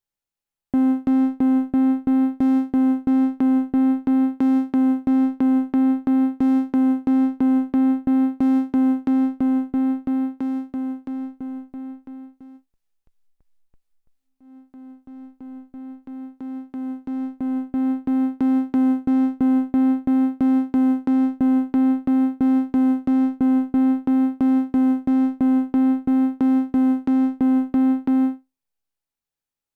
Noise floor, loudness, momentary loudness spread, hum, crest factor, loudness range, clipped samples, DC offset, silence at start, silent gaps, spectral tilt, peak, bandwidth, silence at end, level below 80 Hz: -89 dBFS; -20 LUFS; 12 LU; none; 10 dB; 12 LU; under 0.1%; under 0.1%; 0.75 s; none; -8.5 dB/octave; -12 dBFS; 3.3 kHz; 1.4 s; -56 dBFS